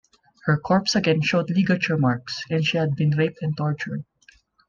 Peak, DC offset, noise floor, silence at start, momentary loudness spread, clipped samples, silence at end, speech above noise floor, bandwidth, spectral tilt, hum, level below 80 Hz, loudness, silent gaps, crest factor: -8 dBFS; under 0.1%; -57 dBFS; 0.45 s; 8 LU; under 0.1%; 0.65 s; 35 dB; 7.4 kHz; -6 dB/octave; none; -58 dBFS; -22 LUFS; none; 16 dB